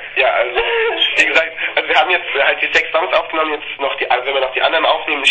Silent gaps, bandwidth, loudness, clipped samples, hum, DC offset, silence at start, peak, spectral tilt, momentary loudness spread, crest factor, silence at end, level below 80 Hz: none; 9.4 kHz; -14 LUFS; under 0.1%; none; 0.2%; 0 s; 0 dBFS; -1 dB/octave; 6 LU; 16 dB; 0 s; -50 dBFS